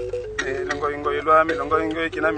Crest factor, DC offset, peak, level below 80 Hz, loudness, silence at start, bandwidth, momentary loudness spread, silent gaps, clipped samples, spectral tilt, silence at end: 18 dB; under 0.1%; -4 dBFS; -44 dBFS; -22 LUFS; 0 s; 9.4 kHz; 9 LU; none; under 0.1%; -5 dB/octave; 0 s